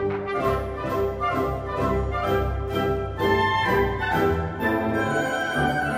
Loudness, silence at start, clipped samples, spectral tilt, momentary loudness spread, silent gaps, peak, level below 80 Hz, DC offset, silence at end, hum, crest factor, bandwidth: -24 LUFS; 0 s; under 0.1%; -6.5 dB/octave; 5 LU; none; -10 dBFS; -36 dBFS; under 0.1%; 0 s; none; 14 dB; 15 kHz